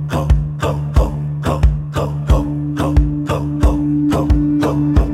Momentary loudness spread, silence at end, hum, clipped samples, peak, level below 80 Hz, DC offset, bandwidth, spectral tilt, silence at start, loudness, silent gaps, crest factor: 5 LU; 0 s; none; under 0.1%; 0 dBFS; -18 dBFS; under 0.1%; 13 kHz; -8 dB/octave; 0 s; -17 LUFS; none; 14 dB